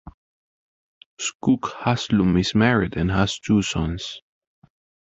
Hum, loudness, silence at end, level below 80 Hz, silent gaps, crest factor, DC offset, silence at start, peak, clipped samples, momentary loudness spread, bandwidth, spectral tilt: none; -22 LUFS; 0.9 s; -40 dBFS; 0.14-1.17 s, 1.35-1.40 s; 20 dB; under 0.1%; 0.05 s; -4 dBFS; under 0.1%; 11 LU; 8.2 kHz; -5.5 dB/octave